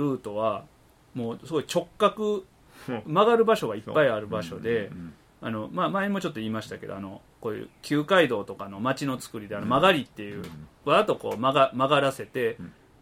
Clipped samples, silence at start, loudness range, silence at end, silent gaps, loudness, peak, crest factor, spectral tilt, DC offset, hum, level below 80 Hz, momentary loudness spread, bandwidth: under 0.1%; 0 s; 6 LU; 0.3 s; none; -26 LUFS; -6 dBFS; 20 dB; -5.5 dB/octave; under 0.1%; none; -60 dBFS; 16 LU; 16 kHz